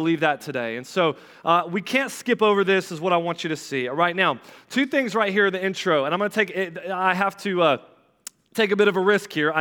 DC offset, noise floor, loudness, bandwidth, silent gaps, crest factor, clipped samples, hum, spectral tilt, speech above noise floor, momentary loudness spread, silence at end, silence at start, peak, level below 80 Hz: under 0.1%; -45 dBFS; -22 LUFS; 18 kHz; none; 18 dB; under 0.1%; none; -4.5 dB/octave; 23 dB; 9 LU; 0 s; 0 s; -6 dBFS; -80 dBFS